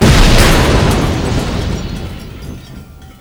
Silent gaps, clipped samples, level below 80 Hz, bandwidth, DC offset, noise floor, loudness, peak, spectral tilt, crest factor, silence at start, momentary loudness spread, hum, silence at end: none; under 0.1%; -16 dBFS; over 20 kHz; under 0.1%; -33 dBFS; -12 LUFS; 0 dBFS; -5 dB/octave; 12 dB; 0 s; 22 LU; none; 0.1 s